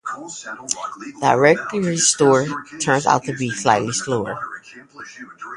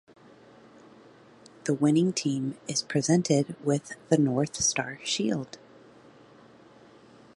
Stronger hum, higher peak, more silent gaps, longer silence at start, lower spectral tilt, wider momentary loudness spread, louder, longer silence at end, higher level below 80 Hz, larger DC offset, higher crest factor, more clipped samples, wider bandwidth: neither; first, 0 dBFS vs -8 dBFS; neither; second, 0.05 s vs 1.65 s; about the same, -3.5 dB/octave vs -4.5 dB/octave; first, 21 LU vs 8 LU; first, -19 LUFS vs -27 LUFS; second, 0 s vs 1.8 s; first, -58 dBFS vs -66 dBFS; neither; about the same, 20 dB vs 22 dB; neither; about the same, 11.5 kHz vs 11.5 kHz